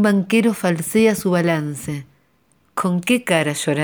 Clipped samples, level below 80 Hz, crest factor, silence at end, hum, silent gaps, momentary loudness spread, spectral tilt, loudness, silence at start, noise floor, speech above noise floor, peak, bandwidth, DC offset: under 0.1%; -58 dBFS; 18 dB; 0 s; none; none; 12 LU; -5.5 dB/octave; -19 LUFS; 0 s; -61 dBFS; 43 dB; 0 dBFS; over 20 kHz; under 0.1%